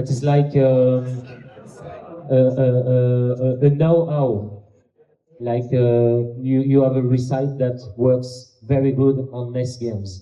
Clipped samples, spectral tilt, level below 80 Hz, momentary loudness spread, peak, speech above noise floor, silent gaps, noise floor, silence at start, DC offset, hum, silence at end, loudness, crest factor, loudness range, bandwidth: under 0.1%; -9 dB/octave; -56 dBFS; 16 LU; -4 dBFS; 41 dB; none; -59 dBFS; 0 s; under 0.1%; none; 0 s; -19 LUFS; 14 dB; 1 LU; 8.4 kHz